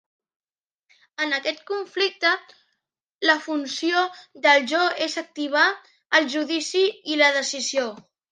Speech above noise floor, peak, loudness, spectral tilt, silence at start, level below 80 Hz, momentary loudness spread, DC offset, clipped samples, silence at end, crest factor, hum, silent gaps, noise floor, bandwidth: 57 dB; -4 dBFS; -22 LUFS; -0.5 dB/octave; 1.2 s; -82 dBFS; 11 LU; under 0.1%; under 0.1%; 0.3 s; 20 dB; none; 3.03-3.07 s, 3.15-3.19 s; -80 dBFS; 10 kHz